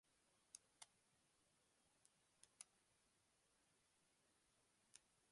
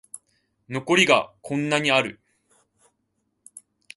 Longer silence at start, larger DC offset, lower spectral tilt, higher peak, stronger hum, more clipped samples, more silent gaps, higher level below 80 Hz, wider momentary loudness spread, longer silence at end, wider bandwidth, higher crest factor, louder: about the same, 0.05 s vs 0.15 s; neither; second, 0 dB/octave vs -3.5 dB/octave; second, -40 dBFS vs -2 dBFS; neither; neither; neither; second, under -90 dBFS vs -68 dBFS; second, 3 LU vs 18 LU; second, 0 s vs 0.35 s; about the same, 11 kHz vs 11.5 kHz; first, 34 dB vs 24 dB; second, -66 LUFS vs -21 LUFS